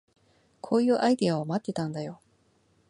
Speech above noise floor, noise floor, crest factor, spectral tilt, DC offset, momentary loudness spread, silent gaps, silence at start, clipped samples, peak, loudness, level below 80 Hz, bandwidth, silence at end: 40 dB; -67 dBFS; 18 dB; -6.5 dB/octave; under 0.1%; 15 LU; none; 0.65 s; under 0.1%; -10 dBFS; -27 LUFS; -72 dBFS; 11 kHz; 0.75 s